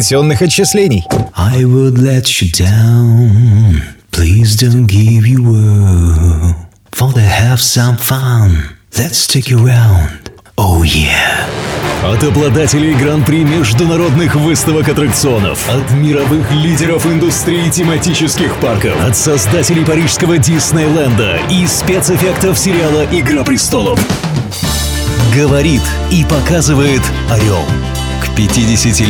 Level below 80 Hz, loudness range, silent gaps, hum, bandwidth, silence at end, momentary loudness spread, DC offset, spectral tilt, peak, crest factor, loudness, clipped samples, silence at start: -24 dBFS; 2 LU; none; none; 18.5 kHz; 0 s; 6 LU; under 0.1%; -5 dB/octave; 0 dBFS; 10 dB; -10 LUFS; under 0.1%; 0 s